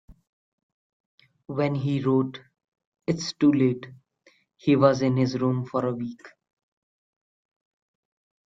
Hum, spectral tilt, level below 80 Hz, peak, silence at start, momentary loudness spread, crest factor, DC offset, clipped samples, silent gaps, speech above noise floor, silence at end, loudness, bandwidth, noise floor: none; -7 dB/octave; -64 dBFS; -6 dBFS; 1.5 s; 15 LU; 22 dB; under 0.1%; under 0.1%; 2.68-2.72 s, 2.87-2.92 s; 39 dB; 2.25 s; -25 LUFS; 7.8 kHz; -63 dBFS